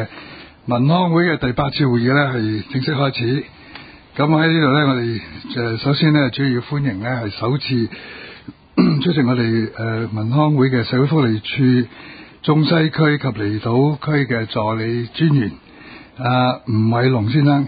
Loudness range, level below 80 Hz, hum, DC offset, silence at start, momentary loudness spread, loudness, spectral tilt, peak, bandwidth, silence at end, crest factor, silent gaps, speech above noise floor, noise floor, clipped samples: 2 LU; -48 dBFS; none; under 0.1%; 0 s; 13 LU; -18 LUFS; -12.5 dB/octave; -2 dBFS; 5 kHz; 0 s; 14 dB; none; 23 dB; -40 dBFS; under 0.1%